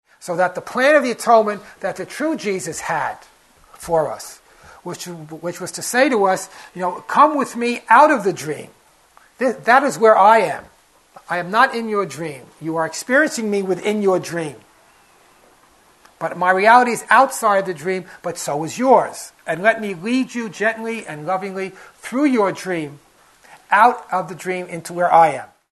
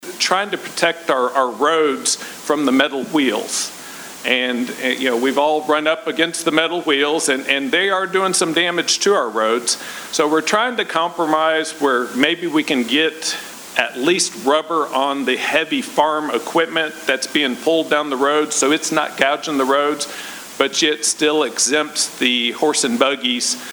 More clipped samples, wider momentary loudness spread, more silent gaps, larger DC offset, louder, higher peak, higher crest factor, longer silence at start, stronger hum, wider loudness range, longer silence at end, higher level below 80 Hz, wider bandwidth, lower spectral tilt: neither; first, 16 LU vs 5 LU; neither; neither; about the same, -18 LUFS vs -17 LUFS; about the same, 0 dBFS vs 0 dBFS; about the same, 18 dB vs 18 dB; first, 0.2 s vs 0 s; neither; first, 7 LU vs 2 LU; first, 0.3 s vs 0 s; about the same, -62 dBFS vs -66 dBFS; second, 12.5 kHz vs over 20 kHz; first, -4 dB/octave vs -1.5 dB/octave